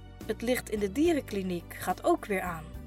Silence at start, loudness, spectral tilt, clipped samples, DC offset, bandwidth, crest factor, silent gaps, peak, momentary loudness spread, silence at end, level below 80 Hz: 0 s; -31 LUFS; -5.5 dB/octave; under 0.1%; under 0.1%; 16 kHz; 16 dB; none; -14 dBFS; 8 LU; 0 s; -48 dBFS